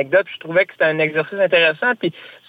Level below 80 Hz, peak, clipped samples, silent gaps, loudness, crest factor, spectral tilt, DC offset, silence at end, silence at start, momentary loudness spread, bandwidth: -66 dBFS; -4 dBFS; under 0.1%; none; -17 LUFS; 14 dB; -6.5 dB/octave; under 0.1%; 0.2 s; 0 s; 6 LU; 4.9 kHz